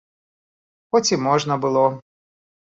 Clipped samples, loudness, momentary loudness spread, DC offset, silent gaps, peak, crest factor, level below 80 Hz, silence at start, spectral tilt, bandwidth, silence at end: under 0.1%; -20 LUFS; 3 LU; under 0.1%; none; -4 dBFS; 18 dB; -64 dBFS; 0.95 s; -4.5 dB/octave; 8 kHz; 0.8 s